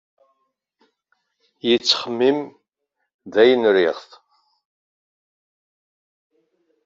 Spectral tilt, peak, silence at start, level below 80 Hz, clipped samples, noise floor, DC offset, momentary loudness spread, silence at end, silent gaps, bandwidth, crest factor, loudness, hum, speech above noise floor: -1.5 dB/octave; -2 dBFS; 1.65 s; -70 dBFS; under 0.1%; -77 dBFS; under 0.1%; 12 LU; 2.85 s; 3.14-3.19 s; 7.6 kHz; 22 dB; -18 LUFS; none; 59 dB